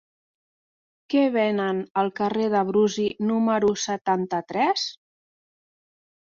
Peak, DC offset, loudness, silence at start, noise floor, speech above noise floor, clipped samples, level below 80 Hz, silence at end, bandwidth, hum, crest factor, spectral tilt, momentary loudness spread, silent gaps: -10 dBFS; under 0.1%; -24 LUFS; 1.1 s; under -90 dBFS; over 67 dB; under 0.1%; -66 dBFS; 1.4 s; 7.6 kHz; none; 16 dB; -5 dB/octave; 5 LU; 1.90-1.95 s, 4.01-4.05 s